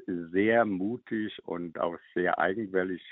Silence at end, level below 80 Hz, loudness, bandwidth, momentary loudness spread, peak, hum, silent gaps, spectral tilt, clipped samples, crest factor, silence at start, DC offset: 0 s; -70 dBFS; -30 LUFS; 4.1 kHz; 10 LU; -12 dBFS; none; none; -4.5 dB/octave; under 0.1%; 18 dB; 0 s; under 0.1%